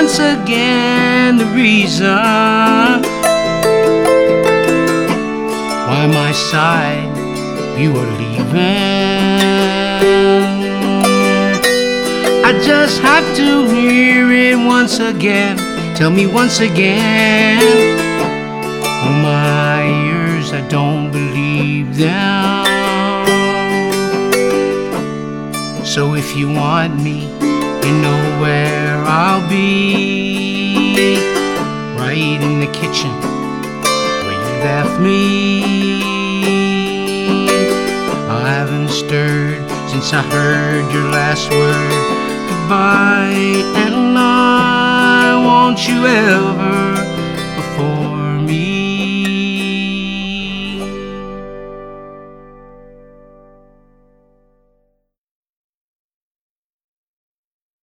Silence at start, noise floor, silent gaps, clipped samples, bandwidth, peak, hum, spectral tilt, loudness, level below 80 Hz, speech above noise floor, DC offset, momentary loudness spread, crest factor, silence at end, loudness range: 0 s; -65 dBFS; none; under 0.1%; 18 kHz; 0 dBFS; none; -5 dB/octave; -13 LUFS; -42 dBFS; 53 dB; under 0.1%; 9 LU; 14 dB; 5.2 s; 6 LU